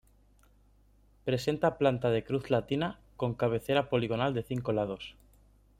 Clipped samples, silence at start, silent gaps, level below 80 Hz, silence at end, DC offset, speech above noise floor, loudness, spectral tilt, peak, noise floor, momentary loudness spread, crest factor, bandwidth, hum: under 0.1%; 1.25 s; none; -58 dBFS; 0.7 s; under 0.1%; 33 dB; -31 LUFS; -7 dB/octave; -12 dBFS; -63 dBFS; 9 LU; 20 dB; 16 kHz; 50 Hz at -55 dBFS